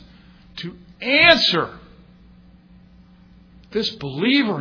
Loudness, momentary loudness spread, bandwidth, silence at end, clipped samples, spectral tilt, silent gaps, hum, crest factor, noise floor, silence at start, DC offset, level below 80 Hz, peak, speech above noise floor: -17 LUFS; 22 LU; 5.4 kHz; 0 s; under 0.1%; -4.5 dB/octave; none; none; 22 dB; -49 dBFS; 0.55 s; under 0.1%; -50 dBFS; 0 dBFS; 30 dB